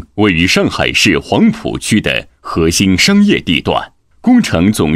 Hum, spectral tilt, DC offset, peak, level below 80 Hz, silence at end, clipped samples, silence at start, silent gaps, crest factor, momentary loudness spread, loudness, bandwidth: none; -4.5 dB/octave; under 0.1%; 0 dBFS; -34 dBFS; 0 s; under 0.1%; 0 s; none; 12 dB; 9 LU; -12 LUFS; 15.5 kHz